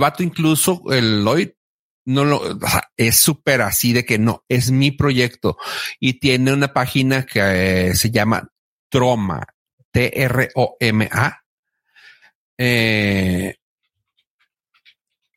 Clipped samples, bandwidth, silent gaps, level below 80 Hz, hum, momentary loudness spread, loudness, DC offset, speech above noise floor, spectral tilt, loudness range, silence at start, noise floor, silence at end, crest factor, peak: under 0.1%; 16.5 kHz; 1.57-2.05 s, 2.92-2.96 s, 8.52-8.90 s, 9.54-9.66 s, 9.73-9.78 s, 9.85-9.92 s, 11.46-11.63 s, 12.35-12.57 s; -48 dBFS; none; 7 LU; -17 LUFS; under 0.1%; 54 dB; -4.5 dB/octave; 5 LU; 0 s; -71 dBFS; 1.85 s; 18 dB; 0 dBFS